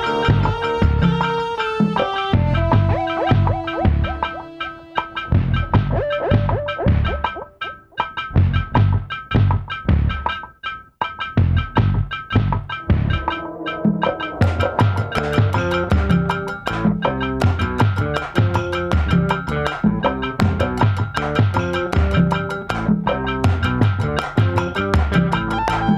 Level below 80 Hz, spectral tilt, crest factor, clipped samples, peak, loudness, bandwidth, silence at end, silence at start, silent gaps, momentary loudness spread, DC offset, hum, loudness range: -28 dBFS; -7.5 dB/octave; 18 dB; under 0.1%; -2 dBFS; -19 LUFS; 10.5 kHz; 0 s; 0 s; none; 7 LU; under 0.1%; none; 2 LU